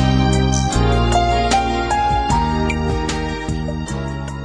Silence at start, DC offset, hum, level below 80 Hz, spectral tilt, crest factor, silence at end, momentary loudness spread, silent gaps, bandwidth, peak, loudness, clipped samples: 0 s; under 0.1%; none; -24 dBFS; -5.5 dB/octave; 14 dB; 0 s; 8 LU; none; 10.5 kHz; -4 dBFS; -18 LUFS; under 0.1%